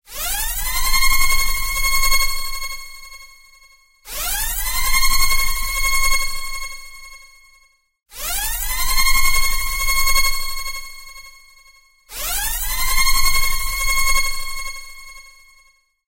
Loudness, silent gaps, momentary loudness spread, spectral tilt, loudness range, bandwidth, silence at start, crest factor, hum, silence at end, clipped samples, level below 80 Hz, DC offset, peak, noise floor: -19 LUFS; none; 20 LU; 0.5 dB/octave; 3 LU; 16 kHz; 0.1 s; 14 dB; none; 0.85 s; under 0.1%; -24 dBFS; under 0.1%; -4 dBFS; -56 dBFS